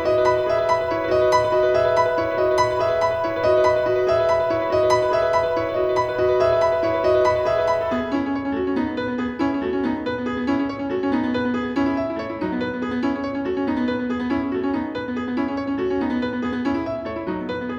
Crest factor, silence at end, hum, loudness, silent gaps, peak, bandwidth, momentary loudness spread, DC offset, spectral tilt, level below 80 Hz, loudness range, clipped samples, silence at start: 16 dB; 0 s; none; -21 LUFS; none; -6 dBFS; 10.5 kHz; 7 LU; under 0.1%; -6 dB/octave; -48 dBFS; 5 LU; under 0.1%; 0 s